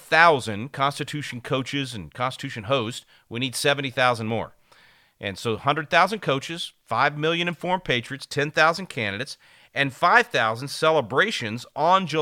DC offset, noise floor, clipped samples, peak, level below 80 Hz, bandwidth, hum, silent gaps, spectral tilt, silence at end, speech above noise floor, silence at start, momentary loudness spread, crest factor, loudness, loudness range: under 0.1%; -56 dBFS; under 0.1%; -2 dBFS; -60 dBFS; 17 kHz; none; none; -4 dB/octave; 0 s; 32 dB; 0 s; 14 LU; 22 dB; -23 LUFS; 4 LU